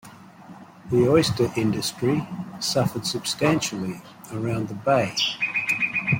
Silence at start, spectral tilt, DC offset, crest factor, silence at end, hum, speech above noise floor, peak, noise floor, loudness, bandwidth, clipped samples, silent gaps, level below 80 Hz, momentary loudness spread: 0.05 s; -4.5 dB/octave; under 0.1%; 18 dB; 0 s; none; 21 dB; -6 dBFS; -45 dBFS; -23 LUFS; 16.5 kHz; under 0.1%; none; -56 dBFS; 11 LU